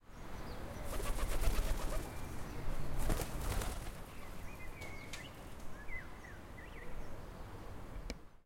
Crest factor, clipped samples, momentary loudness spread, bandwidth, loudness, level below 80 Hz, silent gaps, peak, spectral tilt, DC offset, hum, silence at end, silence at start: 20 dB; under 0.1%; 12 LU; 16.5 kHz; -45 LUFS; -42 dBFS; none; -20 dBFS; -4.5 dB/octave; under 0.1%; none; 0.05 s; 0.05 s